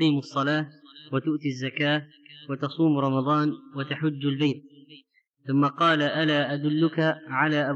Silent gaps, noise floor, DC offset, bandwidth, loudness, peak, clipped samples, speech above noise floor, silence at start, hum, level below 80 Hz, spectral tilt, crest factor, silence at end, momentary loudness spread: 5.29-5.34 s; -59 dBFS; under 0.1%; 7.6 kHz; -25 LUFS; -10 dBFS; under 0.1%; 34 dB; 0 s; none; under -90 dBFS; -7 dB/octave; 16 dB; 0 s; 10 LU